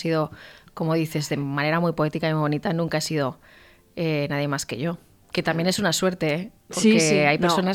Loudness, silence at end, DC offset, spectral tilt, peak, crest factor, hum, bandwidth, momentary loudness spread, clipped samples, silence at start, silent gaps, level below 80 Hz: -23 LUFS; 0 s; under 0.1%; -5 dB/octave; -6 dBFS; 18 dB; none; 16.5 kHz; 11 LU; under 0.1%; 0 s; none; -58 dBFS